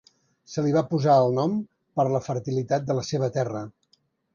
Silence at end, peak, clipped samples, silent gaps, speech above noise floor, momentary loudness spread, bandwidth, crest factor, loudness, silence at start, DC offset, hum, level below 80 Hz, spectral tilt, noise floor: 0.65 s; -8 dBFS; under 0.1%; none; 44 dB; 12 LU; 7.4 kHz; 18 dB; -25 LUFS; 0.5 s; under 0.1%; none; -64 dBFS; -7 dB/octave; -67 dBFS